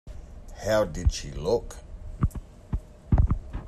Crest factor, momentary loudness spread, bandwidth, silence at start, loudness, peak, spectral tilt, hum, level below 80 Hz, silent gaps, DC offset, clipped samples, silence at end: 18 dB; 19 LU; 13 kHz; 0.05 s; -28 LUFS; -10 dBFS; -6 dB/octave; none; -32 dBFS; none; under 0.1%; under 0.1%; 0 s